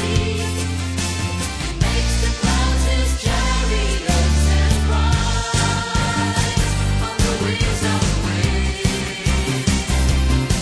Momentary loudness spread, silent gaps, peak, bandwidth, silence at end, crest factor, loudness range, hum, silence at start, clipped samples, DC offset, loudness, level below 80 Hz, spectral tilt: 4 LU; none; -2 dBFS; 11 kHz; 0 s; 16 dB; 2 LU; none; 0 s; under 0.1%; under 0.1%; -19 LUFS; -22 dBFS; -4.5 dB/octave